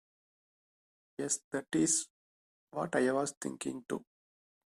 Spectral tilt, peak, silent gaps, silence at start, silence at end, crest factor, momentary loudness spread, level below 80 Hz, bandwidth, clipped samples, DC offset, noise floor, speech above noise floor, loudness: -3.5 dB/octave; -16 dBFS; 1.44-1.51 s, 2.10-2.67 s, 3.37-3.41 s; 1.2 s; 0.75 s; 22 dB; 13 LU; -76 dBFS; 14 kHz; under 0.1%; under 0.1%; under -90 dBFS; over 56 dB; -34 LUFS